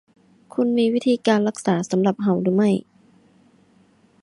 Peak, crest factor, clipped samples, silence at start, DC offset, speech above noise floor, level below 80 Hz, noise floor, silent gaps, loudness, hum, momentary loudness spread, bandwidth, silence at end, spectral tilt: -6 dBFS; 16 dB; under 0.1%; 0.55 s; under 0.1%; 37 dB; -64 dBFS; -57 dBFS; none; -21 LUFS; none; 5 LU; 11.5 kHz; 1.4 s; -6.5 dB/octave